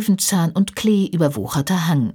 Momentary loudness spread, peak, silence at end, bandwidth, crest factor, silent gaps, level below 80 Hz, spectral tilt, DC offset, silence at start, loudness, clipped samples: 3 LU; -4 dBFS; 0 s; 19 kHz; 14 dB; none; -52 dBFS; -5 dB/octave; under 0.1%; 0 s; -19 LUFS; under 0.1%